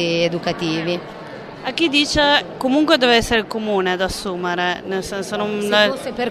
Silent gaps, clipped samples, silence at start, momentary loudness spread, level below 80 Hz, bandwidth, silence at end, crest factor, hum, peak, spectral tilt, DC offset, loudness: none; under 0.1%; 0 s; 11 LU; -44 dBFS; 13.5 kHz; 0 s; 18 dB; none; 0 dBFS; -4 dB/octave; under 0.1%; -18 LUFS